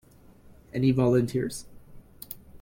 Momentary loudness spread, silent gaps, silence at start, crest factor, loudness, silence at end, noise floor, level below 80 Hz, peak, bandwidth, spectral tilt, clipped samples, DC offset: 19 LU; none; 0.75 s; 18 dB; -26 LUFS; 0.05 s; -53 dBFS; -54 dBFS; -12 dBFS; 16.5 kHz; -7 dB/octave; under 0.1%; under 0.1%